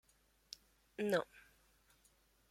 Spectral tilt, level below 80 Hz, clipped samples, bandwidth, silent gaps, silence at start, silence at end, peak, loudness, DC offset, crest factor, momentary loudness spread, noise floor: -5 dB/octave; -78 dBFS; under 0.1%; 16.5 kHz; none; 1 s; 1.1 s; -22 dBFS; -40 LUFS; under 0.1%; 24 dB; 18 LU; -73 dBFS